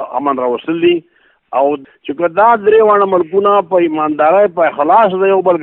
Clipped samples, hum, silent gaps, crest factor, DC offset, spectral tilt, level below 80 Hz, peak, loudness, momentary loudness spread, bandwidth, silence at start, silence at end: under 0.1%; none; none; 12 dB; under 0.1%; -8.5 dB/octave; -58 dBFS; 0 dBFS; -12 LUFS; 8 LU; 4 kHz; 0 s; 0 s